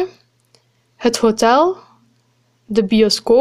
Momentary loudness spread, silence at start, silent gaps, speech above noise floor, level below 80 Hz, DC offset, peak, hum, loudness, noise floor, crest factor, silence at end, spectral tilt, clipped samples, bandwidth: 9 LU; 0 s; none; 46 dB; -50 dBFS; under 0.1%; 0 dBFS; none; -15 LUFS; -60 dBFS; 16 dB; 0 s; -4 dB/octave; under 0.1%; 15 kHz